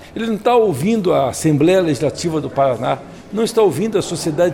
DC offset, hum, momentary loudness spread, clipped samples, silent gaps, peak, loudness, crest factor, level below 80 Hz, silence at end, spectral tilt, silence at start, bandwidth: under 0.1%; none; 7 LU; under 0.1%; none; -4 dBFS; -17 LUFS; 12 dB; -48 dBFS; 0 s; -6 dB/octave; 0 s; 17 kHz